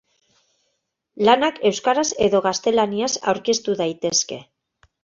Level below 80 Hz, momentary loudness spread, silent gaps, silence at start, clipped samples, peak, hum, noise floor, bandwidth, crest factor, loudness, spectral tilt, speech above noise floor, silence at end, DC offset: -58 dBFS; 6 LU; none; 1.15 s; under 0.1%; -2 dBFS; none; -74 dBFS; 7.6 kHz; 20 dB; -20 LUFS; -3 dB/octave; 54 dB; 0.6 s; under 0.1%